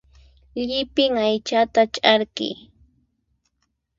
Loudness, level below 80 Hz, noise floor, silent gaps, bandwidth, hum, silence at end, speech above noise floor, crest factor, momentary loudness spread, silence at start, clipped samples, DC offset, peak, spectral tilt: -20 LUFS; -56 dBFS; -73 dBFS; none; 7.6 kHz; none; 1.45 s; 53 dB; 22 dB; 12 LU; 0.55 s; under 0.1%; under 0.1%; 0 dBFS; -3.5 dB/octave